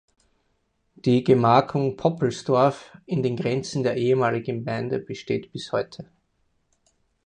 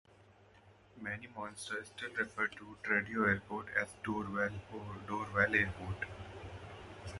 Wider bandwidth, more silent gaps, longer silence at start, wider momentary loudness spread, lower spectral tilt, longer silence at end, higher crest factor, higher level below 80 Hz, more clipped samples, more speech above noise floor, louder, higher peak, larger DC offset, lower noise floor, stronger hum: second, 9.8 kHz vs 11.5 kHz; neither; first, 1.05 s vs 0.1 s; second, 10 LU vs 17 LU; first, -7 dB/octave vs -5.5 dB/octave; first, 1.25 s vs 0 s; about the same, 20 dB vs 24 dB; about the same, -60 dBFS vs -58 dBFS; neither; first, 48 dB vs 26 dB; first, -23 LUFS vs -37 LUFS; first, -4 dBFS vs -14 dBFS; neither; first, -71 dBFS vs -63 dBFS; neither